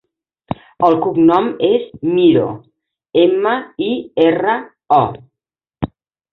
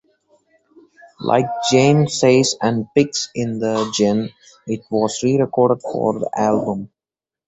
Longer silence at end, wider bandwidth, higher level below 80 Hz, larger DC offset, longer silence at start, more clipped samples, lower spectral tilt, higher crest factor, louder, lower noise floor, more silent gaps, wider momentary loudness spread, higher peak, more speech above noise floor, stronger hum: second, 0.45 s vs 0.6 s; second, 4.4 kHz vs 8.2 kHz; first, -50 dBFS vs -56 dBFS; neither; second, 0.8 s vs 1.2 s; neither; first, -9 dB/octave vs -5 dB/octave; about the same, 14 dB vs 16 dB; first, -15 LUFS vs -18 LUFS; second, -85 dBFS vs -90 dBFS; neither; about the same, 14 LU vs 13 LU; about the same, -2 dBFS vs -2 dBFS; about the same, 71 dB vs 72 dB; neither